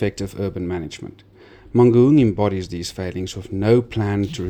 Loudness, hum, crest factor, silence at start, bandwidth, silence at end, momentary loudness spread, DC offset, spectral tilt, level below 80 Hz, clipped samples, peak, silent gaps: -19 LUFS; none; 16 dB; 0 s; 14.5 kHz; 0 s; 15 LU; under 0.1%; -7.5 dB/octave; -46 dBFS; under 0.1%; -4 dBFS; none